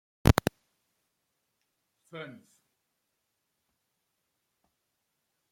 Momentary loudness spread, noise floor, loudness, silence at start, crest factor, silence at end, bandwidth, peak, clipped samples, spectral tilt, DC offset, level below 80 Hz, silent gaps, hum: 21 LU; -81 dBFS; -27 LUFS; 0.25 s; 32 dB; 3.25 s; 16.5 kHz; -4 dBFS; under 0.1%; -6 dB/octave; under 0.1%; -44 dBFS; none; none